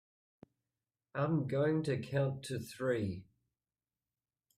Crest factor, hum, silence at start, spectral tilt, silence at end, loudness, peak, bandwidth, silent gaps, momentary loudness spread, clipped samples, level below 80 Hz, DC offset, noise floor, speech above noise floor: 16 dB; none; 1.15 s; -7 dB/octave; 1.35 s; -36 LUFS; -22 dBFS; 15 kHz; none; 9 LU; under 0.1%; -72 dBFS; under 0.1%; under -90 dBFS; over 55 dB